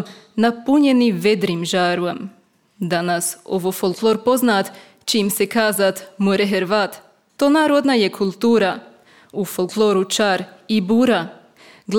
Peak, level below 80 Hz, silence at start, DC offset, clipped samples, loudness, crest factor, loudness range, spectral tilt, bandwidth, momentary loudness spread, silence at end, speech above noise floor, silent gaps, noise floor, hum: -4 dBFS; -64 dBFS; 0 s; under 0.1%; under 0.1%; -18 LUFS; 16 dB; 2 LU; -4.5 dB/octave; 18.5 kHz; 10 LU; 0 s; 30 dB; none; -48 dBFS; none